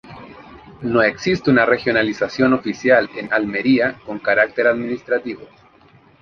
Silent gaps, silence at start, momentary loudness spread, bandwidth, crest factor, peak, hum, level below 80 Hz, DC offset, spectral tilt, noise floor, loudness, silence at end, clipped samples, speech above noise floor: none; 0.05 s; 10 LU; 7 kHz; 18 dB; 0 dBFS; none; -52 dBFS; under 0.1%; -6 dB/octave; -50 dBFS; -18 LUFS; 0.75 s; under 0.1%; 33 dB